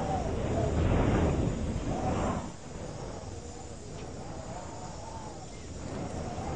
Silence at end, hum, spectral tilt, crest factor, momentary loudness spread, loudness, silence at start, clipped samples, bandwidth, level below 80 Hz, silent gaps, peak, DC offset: 0 s; none; -6.5 dB/octave; 18 dB; 15 LU; -34 LUFS; 0 s; under 0.1%; 9.6 kHz; -40 dBFS; none; -14 dBFS; 0.3%